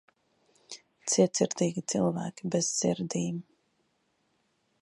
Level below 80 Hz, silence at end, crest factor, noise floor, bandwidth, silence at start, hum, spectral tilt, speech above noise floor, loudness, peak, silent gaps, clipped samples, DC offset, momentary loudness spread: -72 dBFS; 1.4 s; 22 dB; -74 dBFS; 11.5 kHz; 0.7 s; none; -4.5 dB/octave; 45 dB; -29 LUFS; -10 dBFS; none; under 0.1%; under 0.1%; 16 LU